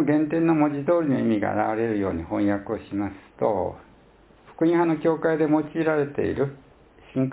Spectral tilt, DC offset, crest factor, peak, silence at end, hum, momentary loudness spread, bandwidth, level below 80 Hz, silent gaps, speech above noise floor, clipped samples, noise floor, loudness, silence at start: -12 dB/octave; under 0.1%; 16 dB; -8 dBFS; 0 s; none; 8 LU; 4 kHz; -52 dBFS; none; 31 dB; under 0.1%; -54 dBFS; -24 LUFS; 0 s